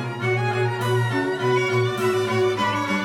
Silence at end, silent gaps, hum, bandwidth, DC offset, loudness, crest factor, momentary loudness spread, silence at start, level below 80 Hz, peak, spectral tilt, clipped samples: 0 s; none; none; 16 kHz; under 0.1%; -22 LUFS; 12 dB; 2 LU; 0 s; -60 dBFS; -10 dBFS; -6 dB/octave; under 0.1%